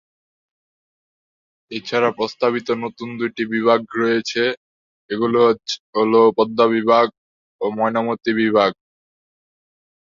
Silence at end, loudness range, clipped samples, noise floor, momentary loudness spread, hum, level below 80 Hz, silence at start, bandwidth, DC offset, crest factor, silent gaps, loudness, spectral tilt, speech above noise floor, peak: 1.35 s; 5 LU; under 0.1%; under -90 dBFS; 11 LU; none; -64 dBFS; 1.7 s; 7.4 kHz; under 0.1%; 18 dB; 4.57-5.09 s, 5.80-5.93 s, 7.18-7.59 s; -19 LUFS; -5 dB/octave; over 72 dB; -2 dBFS